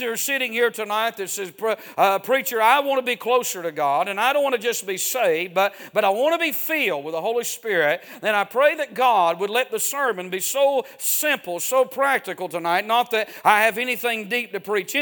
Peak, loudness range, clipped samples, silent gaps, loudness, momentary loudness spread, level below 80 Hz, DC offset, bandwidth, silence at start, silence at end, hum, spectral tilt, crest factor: -2 dBFS; 1 LU; under 0.1%; none; -21 LUFS; 7 LU; -78 dBFS; under 0.1%; 19.5 kHz; 0 s; 0 s; none; -1.5 dB/octave; 20 dB